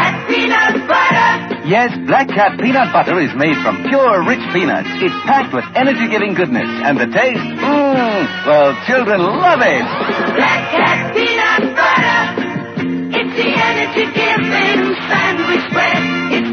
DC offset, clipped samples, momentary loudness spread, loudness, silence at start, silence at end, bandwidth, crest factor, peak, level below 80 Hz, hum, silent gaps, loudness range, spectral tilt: under 0.1%; under 0.1%; 5 LU; -13 LUFS; 0 s; 0 s; 6.6 kHz; 14 dB; 0 dBFS; -56 dBFS; none; none; 2 LU; -5.5 dB/octave